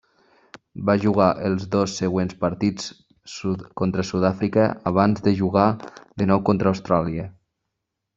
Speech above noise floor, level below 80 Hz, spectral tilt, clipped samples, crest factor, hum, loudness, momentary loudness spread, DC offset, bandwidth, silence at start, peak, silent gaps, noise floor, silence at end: 59 dB; -54 dBFS; -7 dB/octave; under 0.1%; 20 dB; none; -22 LUFS; 13 LU; under 0.1%; 7.6 kHz; 0.75 s; -2 dBFS; none; -80 dBFS; 0.85 s